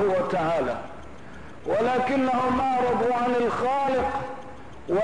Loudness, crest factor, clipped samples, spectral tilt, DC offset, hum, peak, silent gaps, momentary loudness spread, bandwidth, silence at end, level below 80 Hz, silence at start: -24 LUFS; 10 dB; under 0.1%; -6.5 dB/octave; 0.8%; none; -14 dBFS; none; 19 LU; 10.5 kHz; 0 s; -50 dBFS; 0 s